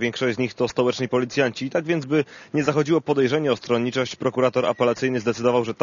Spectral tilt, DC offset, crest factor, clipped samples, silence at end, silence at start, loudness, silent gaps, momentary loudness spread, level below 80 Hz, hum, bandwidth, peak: -5.5 dB/octave; under 0.1%; 18 dB; under 0.1%; 0 s; 0 s; -22 LUFS; none; 4 LU; -64 dBFS; none; 7.4 kHz; -4 dBFS